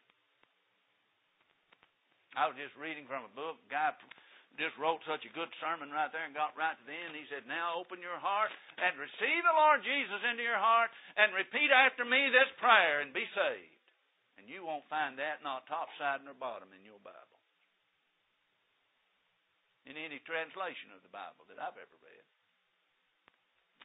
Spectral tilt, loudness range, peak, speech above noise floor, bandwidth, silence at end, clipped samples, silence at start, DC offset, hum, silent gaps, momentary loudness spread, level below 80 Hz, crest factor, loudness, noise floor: 5 dB/octave; 17 LU; -10 dBFS; 44 dB; 3.9 kHz; 2 s; under 0.1%; 2.35 s; under 0.1%; none; none; 19 LU; under -90 dBFS; 26 dB; -32 LUFS; -78 dBFS